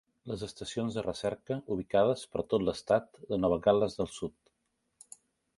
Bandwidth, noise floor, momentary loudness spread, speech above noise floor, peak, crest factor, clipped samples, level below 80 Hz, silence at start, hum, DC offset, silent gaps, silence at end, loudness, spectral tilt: 11.5 kHz; -80 dBFS; 14 LU; 49 dB; -12 dBFS; 22 dB; under 0.1%; -58 dBFS; 0.25 s; none; under 0.1%; none; 1.3 s; -32 LUFS; -6 dB/octave